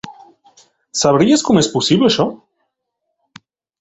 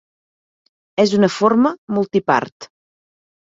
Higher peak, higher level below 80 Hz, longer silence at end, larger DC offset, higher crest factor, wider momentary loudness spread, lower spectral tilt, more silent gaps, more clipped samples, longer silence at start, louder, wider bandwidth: about the same, 0 dBFS vs 0 dBFS; first, -52 dBFS vs -62 dBFS; first, 1.45 s vs 0.75 s; neither; about the same, 18 dB vs 18 dB; about the same, 10 LU vs 8 LU; second, -4.5 dB/octave vs -6 dB/octave; second, none vs 1.78-1.88 s, 2.52-2.60 s; neither; second, 0.05 s vs 1 s; first, -14 LUFS vs -17 LUFS; about the same, 8.2 kHz vs 7.8 kHz